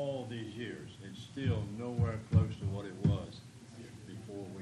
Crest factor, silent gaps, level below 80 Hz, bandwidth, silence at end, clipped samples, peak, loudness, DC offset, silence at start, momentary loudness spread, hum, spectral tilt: 22 dB; none; -54 dBFS; 11 kHz; 0 s; under 0.1%; -14 dBFS; -36 LUFS; under 0.1%; 0 s; 19 LU; none; -7.5 dB/octave